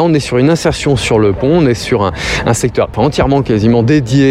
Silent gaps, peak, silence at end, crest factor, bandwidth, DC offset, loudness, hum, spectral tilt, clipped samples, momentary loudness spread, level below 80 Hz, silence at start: none; 0 dBFS; 0 s; 10 dB; 14 kHz; under 0.1%; -12 LUFS; none; -6 dB/octave; under 0.1%; 3 LU; -30 dBFS; 0 s